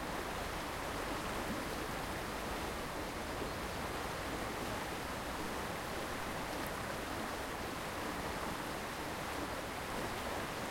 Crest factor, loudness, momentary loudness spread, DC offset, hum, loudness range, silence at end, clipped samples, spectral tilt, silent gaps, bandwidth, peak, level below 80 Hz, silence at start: 14 dB; -40 LUFS; 1 LU; under 0.1%; none; 0 LU; 0 s; under 0.1%; -4 dB/octave; none; 16.5 kHz; -28 dBFS; -52 dBFS; 0 s